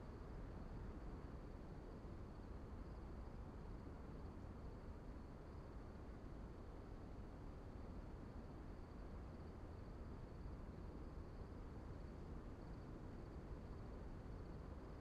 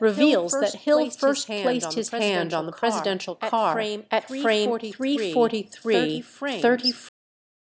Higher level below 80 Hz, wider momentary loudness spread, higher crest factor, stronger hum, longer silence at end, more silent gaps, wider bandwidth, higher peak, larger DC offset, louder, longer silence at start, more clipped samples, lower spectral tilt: first, -56 dBFS vs -78 dBFS; second, 2 LU vs 7 LU; second, 12 dB vs 18 dB; neither; second, 0 s vs 0.7 s; neither; first, 10.5 kHz vs 8 kHz; second, -40 dBFS vs -6 dBFS; neither; second, -56 LUFS vs -24 LUFS; about the same, 0 s vs 0 s; neither; first, -8 dB/octave vs -3.5 dB/octave